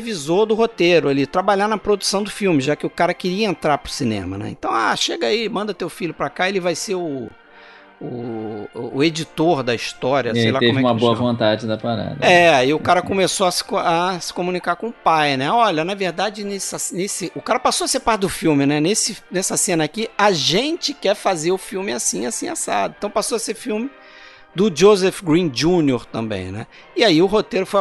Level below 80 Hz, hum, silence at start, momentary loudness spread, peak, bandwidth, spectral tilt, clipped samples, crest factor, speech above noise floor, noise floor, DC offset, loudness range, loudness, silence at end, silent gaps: -50 dBFS; none; 0 s; 10 LU; 0 dBFS; 12.5 kHz; -4 dB/octave; under 0.1%; 18 dB; 26 dB; -44 dBFS; under 0.1%; 6 LU; -19 LUFS; 0 s; none